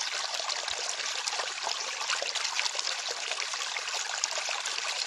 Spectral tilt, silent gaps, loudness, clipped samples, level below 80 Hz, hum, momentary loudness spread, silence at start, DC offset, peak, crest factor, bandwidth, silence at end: 3.5 dB/octave; none; -30 LUFS; under 0.1%; -78 dBFS; none; 3 LU; 0 s; under 0.1%; -6 dBFS; 26 dB; 12.5 kHz; 0 s